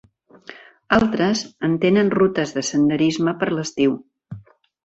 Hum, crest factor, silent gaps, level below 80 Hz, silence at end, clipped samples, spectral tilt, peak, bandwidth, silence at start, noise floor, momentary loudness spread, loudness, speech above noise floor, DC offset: none; 18 dB; none; -52 dBFS; 0.45 s; under 0.1%; -5.5 dB/octave; -2 dBFS; 8.2 kHz; 0.5 s; -44 dBFS; 23 LU; -19 LUFS; 26 dB; under 0.1%